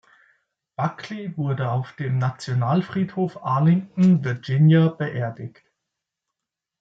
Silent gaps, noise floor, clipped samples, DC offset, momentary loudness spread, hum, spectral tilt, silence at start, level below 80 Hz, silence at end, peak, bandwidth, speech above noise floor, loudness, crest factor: none; -86 dBFS; under 0.1%; under 0.1%; 13 LU; none; -8.5 dB/octave; 0.8 s; -66 dBFS; 1.3 s; -8 dBFS; 7.8 kHz; 65 dB; -22 LUFS; 16 dB